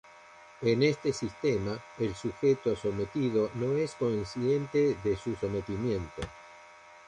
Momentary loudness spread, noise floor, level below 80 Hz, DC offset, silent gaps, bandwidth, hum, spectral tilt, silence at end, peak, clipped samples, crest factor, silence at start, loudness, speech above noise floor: 8 LU; -53 dBFS; -54 dBFS; under 0.1%; none; 10 kHz; none; -6.5 dB/octave; 0.1 s; -14 dBFS; under 0.1%; 16 dB; 0.15 s; -30 LUFS; 23 dB